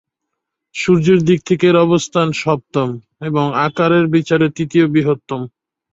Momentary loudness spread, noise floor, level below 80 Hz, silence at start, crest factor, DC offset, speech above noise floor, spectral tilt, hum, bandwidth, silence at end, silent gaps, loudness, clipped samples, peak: 11 LU; -78 dBFS; -54 dBFS; 0.75 s; 14 dB; under 0.1%; 63 dB; -6.5 dB/octave; none; 8 kHz; 0.45 s; none; -15 LUFS; under 0.1%; -2 dBFS